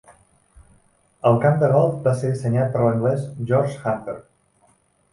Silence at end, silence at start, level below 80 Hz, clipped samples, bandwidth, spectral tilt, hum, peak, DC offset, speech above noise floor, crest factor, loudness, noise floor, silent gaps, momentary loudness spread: 0.9 s; 1.25 s; -56 dBFS; under 0.1%; 11.5 kHz; -8.5 dB/octave; none; -4 dBFS; under 0.1%; 41 dB; 18 dB; -20 LUFS; -61 dBFS; none; 9 LU